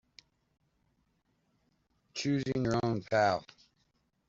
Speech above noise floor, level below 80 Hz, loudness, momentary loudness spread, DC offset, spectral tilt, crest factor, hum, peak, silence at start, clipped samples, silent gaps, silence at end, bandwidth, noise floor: 45 dB; -64 dBFS; -32 LUFS; 9 LU; under 0.1%; -6 dB/octave; 20 dB; none; -16 dBFS; 2.15 s; under 0.1%; none; 0.85 s; 7.8 kHz; -76 dBFS